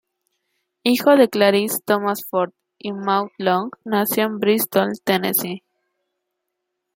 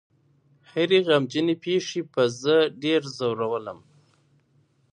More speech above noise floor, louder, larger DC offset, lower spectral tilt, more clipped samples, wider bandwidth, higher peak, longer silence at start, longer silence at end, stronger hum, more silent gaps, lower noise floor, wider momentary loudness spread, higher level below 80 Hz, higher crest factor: first, 60 dB vs 41 dB; first, -19 LUFS vs -24 LUFS; neither; about the same, -4 dB/octave vs -5 dB/octave; neither; first, 16.5 kHz vs 10 kHz; first, -2 dBFS vs -6 dBFS; about the same, 0.85 s vs 0.75 s; first, 1.4 s vs 1.15 s; neither; neither; first, -78 dBFS vs -64 dBFS; first, 12 LU vs 8 LU; first, -68 dBFS vs -74 dBFS; about the same, 18 dB vs 18 dB